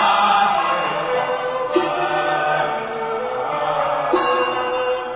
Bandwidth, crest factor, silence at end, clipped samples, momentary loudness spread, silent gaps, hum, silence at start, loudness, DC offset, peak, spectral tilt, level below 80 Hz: 4 kHz; 16 dB; 0 s; under 0.1%; 7 LU; none; none; 0 s; -19 LUFS; under 0.1%; -4 dBFS; -8 dB/octave; -56 dBFS